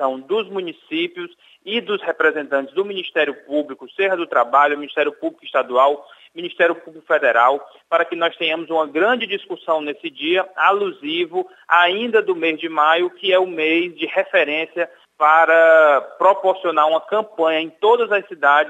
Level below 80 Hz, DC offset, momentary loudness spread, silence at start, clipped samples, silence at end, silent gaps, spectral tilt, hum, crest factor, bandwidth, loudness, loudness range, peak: -84 dBFS; under 0.1%; 11 LU; 0 s; under 0.1%; 0 s; none; -5 dB/octave; none; 18 dB; 8 kHz; -18 LUFS; 5 LU; 0 dBFS